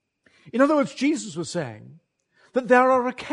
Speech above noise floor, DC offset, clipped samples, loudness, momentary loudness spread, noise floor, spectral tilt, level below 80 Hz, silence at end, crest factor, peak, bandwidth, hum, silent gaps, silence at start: 41 dB; under 0.1%; under 0.1%; -22 LUFS; 13 LU; -62 dBFS; -5 dB/octave; -68 dBFS; 0 s; 20 dB; -4 dBFS; 10.5 kHz; none; none; 0.45 s